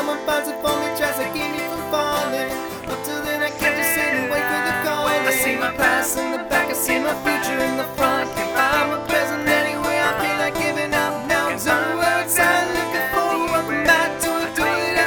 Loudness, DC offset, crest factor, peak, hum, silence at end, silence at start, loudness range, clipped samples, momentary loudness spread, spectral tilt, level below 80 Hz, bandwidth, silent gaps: -20 LUFS; under 0.1%; 18 dB; -2 dBFS; none; 0 s; 0 s; 3 LU; under 0.1%; 6 LU; -2.5 dB/octave; -48 dBFS; over 20 kHz; none